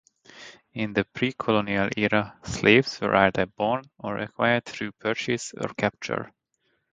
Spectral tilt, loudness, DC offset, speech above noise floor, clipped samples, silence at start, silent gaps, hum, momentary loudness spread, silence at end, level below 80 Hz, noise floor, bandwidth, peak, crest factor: -5 dB/octave; -25 LUFS; under 0.1%; 48 dB; under 0.1%; 0.35 s; none; none; 13 LU; 0.65 s; -56 dBFS; -73 dBFS; 9.4 kHz; -2 dBFS; 24 dB